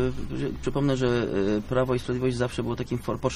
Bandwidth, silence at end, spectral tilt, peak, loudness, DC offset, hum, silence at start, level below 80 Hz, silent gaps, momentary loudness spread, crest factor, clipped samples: 13.5 kHz; 0 s; -7 dB/octave; -10 dBFS; -27 LUFS; under 0.1%; none; 0 s; -40 dBFS; none; 6 LU; 16 dB; under 0.1%